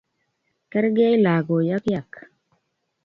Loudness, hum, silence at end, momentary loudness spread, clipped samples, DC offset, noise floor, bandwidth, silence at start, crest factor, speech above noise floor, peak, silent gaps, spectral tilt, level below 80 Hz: -21 LUFS; none; 0.85 s; 10 LU; under 0.1%; under 0.1%; -73 dBFS; 7 kHz; 0.75 s; 16 dB; 53 dB; -8 dBFS; none; -9 dB/octave; -62 dBFS